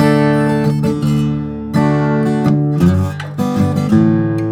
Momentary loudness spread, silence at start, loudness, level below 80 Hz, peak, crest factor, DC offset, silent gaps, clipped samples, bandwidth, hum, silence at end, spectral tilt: 6 LU; 0 s; -14 LUFS; -42 dBFS; 0 dBFS; 14 dB; under 0.1%; none; under 0.1%; 14.5 kHz; none; 0 s; -8 dB/octave